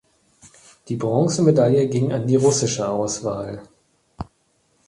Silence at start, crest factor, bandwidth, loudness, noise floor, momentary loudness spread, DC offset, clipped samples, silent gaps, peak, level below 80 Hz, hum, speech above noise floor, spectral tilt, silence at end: 0.85 s; 18 dB; 11.5 kHz; -20 LUFS; -65 dBFS; 21 LU; under 0.1%; under 0.1%; none; -4 dBFS; -52 dBFS; none; 45 dB; -6 dB/octave; 0.65 s